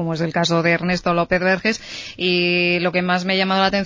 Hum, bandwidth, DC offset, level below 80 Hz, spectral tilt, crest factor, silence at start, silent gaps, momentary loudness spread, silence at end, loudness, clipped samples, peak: none; 7.6 kHz; under 0.1%; -50 dBFS; -5 dB/octave; 16 dB; 0 s; none; 5 LU; 0 s; -18 LUFS; under 0.1%; -4 dBFS